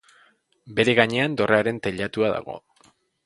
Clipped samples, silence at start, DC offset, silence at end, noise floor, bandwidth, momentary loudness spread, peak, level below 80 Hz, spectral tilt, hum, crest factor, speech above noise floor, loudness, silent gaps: under 0.1%; 0.65 s; under 0.1%; 0.7 s; -60 dBFS; 11.5 kHz; 12 LU; 0 dBFS; -58 dBFS; -5.5 dB/octave; none; 24 dB; 38 dB; -22 LUFS; none